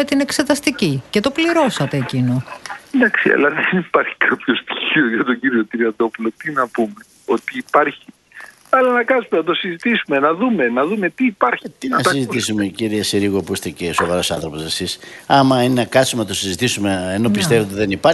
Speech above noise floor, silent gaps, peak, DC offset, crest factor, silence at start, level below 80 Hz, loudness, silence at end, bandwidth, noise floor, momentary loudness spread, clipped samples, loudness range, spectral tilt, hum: 23 dB; none; 0 dBFS; under 0.1%; 18 dB; 0 s; -52 dBFS; -17 LUFS; 0 s; 12.5 kHz; -40 dBFS; 7 LU; under 0.1%; 3 LU; -4.5 dB/octave; none